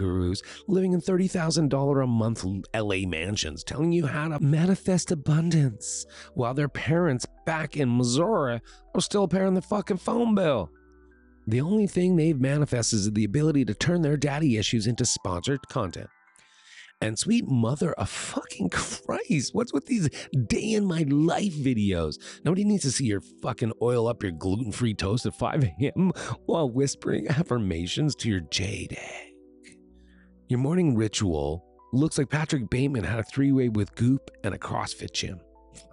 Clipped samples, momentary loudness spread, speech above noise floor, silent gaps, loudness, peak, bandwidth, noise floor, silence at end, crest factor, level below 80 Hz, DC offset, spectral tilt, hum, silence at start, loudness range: under 0.1%; 8 LU; 33 dB; none; -26 LUFS; -14 dBFS; 11.5 kHz; -58 dBFS; 0.1 s; 12 dB; -50 dBFS; under 0.1%; -5.5 dB/octave; none; 0 s; 4 LU